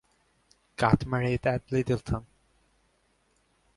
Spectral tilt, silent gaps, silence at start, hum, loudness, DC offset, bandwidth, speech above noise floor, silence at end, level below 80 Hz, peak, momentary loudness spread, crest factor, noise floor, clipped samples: -7.5 dB/octave; none; 0.8 s; none; -28 LUFS; under 0.1%; 11.5 kHz; 43 dB; 1.55 s; -48 dBFS; -6 dBFS; 10 LU; 24 dB; -70 dBFS; under 0.1%